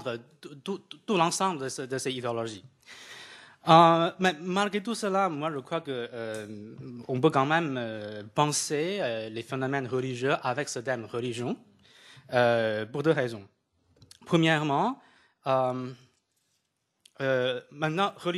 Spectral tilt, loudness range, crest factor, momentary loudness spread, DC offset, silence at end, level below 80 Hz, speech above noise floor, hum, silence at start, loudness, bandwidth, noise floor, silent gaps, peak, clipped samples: -4.5 dB/octave; 6 LU; 24 dB; 17 LU; under 0.1%; 0 s; -74 dBFS; 50 dB; none; 0 s; -28 LUFS; 13 kHz; -78 dBFS; none; -4 dBFS; under 0.1%